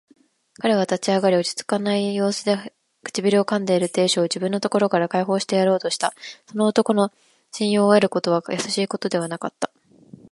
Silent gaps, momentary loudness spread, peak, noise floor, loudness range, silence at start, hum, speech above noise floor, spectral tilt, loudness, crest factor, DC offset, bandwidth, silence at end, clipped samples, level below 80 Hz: none; 10 LU; -2 dBFS; -47 dBFS; 1 LU; 0.65 s; none; 26 dB; -4.5 dB/octave; -21 LUFS; 20 dB; under 0.1%; 11.5 kHz; 0.65 s; under 0.1%; -72 dBFS